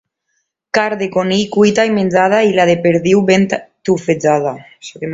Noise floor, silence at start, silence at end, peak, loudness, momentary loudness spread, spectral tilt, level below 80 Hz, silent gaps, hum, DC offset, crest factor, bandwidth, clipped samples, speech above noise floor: -69 dBFS; 0.75 s; 0 s; 0 dBFS; -13 LUFS; 9 LU; -5.5 dB/octave; -54 dBFS; none; none; under 0.1%; 14 dB; 7.8 kHz; under 0.1%; 55 dB